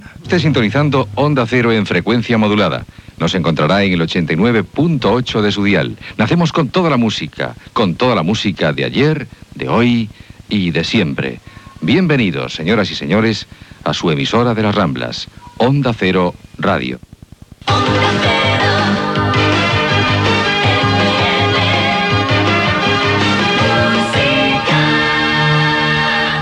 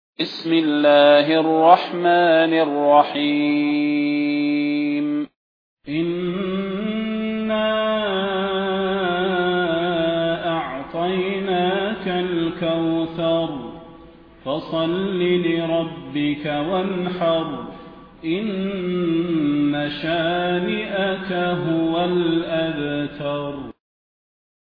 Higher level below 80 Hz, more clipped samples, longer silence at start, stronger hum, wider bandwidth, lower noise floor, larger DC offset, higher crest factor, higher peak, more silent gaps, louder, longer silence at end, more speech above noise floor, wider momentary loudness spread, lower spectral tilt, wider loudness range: first, -40 dBFS vs -54 dBFS; neither; second, 0 s vs 0.2 s; neither; first, 11 kHz vs 5.2 kHz; second, -38 dBFS vs -45 dBFS; neither; second, 14 dB vs 20 dB; about the same, 0 dBFS vs 0 dBFS; second, none vs 5.36-5.77 s; first, -14 LUFS vs -20 LUFS; second, 0 s vs 0.9 s; about the same, 24 dB vs 26 dB; second, 8 LU vs 11 LU; second, -6 dB/octave vs -8.5 dB/octave; second, 4 LU vs 7 LU